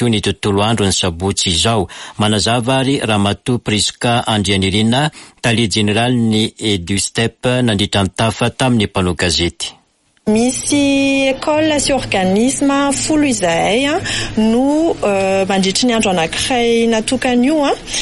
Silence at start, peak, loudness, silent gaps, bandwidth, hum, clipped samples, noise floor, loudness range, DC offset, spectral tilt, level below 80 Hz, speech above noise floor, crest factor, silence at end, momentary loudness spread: 0 s; -2 dBFS; -14 LUFS; none; 11.5 kHz; none; under 0.1%; -56 dBFS; 1 LU; under 0.1%; -4 dB/octave; -38 dBFS; 41 dB; 12 dB; 0 s; 3 LU